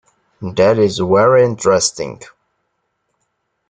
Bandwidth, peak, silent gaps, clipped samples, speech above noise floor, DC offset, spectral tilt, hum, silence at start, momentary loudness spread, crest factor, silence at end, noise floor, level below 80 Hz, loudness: 9.6 kHz; -2 dBFS; none; under 0.1%; 56 dB; under 0.1%; -4.5 dB/octave; none; 0.4 s; 16 LU; 16 dB; 1.45 s; -69 dBFS; -54 dBFS; -13 LUFS